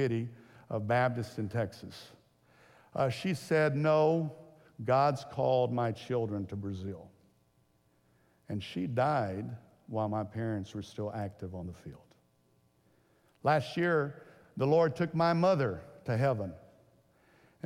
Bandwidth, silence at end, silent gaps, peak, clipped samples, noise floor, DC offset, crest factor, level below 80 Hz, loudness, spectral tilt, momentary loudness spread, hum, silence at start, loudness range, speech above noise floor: 15 kHz; 1.05 s; none; -16 dBFS; under 0.1%; -70 dBFS; under 0.1%; 18 dB; -70 dBFS; -32 LUFS; -7.5 dB/octave; 16 LU; none; 0 s; 9 LU; 39 dB